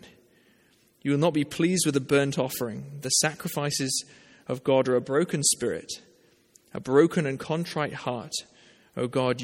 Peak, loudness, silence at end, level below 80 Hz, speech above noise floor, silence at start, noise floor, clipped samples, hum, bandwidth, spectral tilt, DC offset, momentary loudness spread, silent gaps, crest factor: -6 dBFS; -26 LUFS; 0 s; -66 dBFS; 37 dB; 0.05 s; -63 dBFS; under 0.1%; none; 16.5 kHz; -4 dB/octave; under 0.1%; 13 LU; none; 20 dB